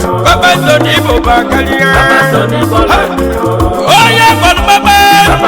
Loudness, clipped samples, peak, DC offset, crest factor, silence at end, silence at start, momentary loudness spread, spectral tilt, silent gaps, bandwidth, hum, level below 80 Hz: -7 LUFS; 2%; 0 dBFS; under 0.1%; 6 dB; 0 s; 0 s; 6 LU; -4 dB/octave; none; over 20 kHz; none; -22 dBFS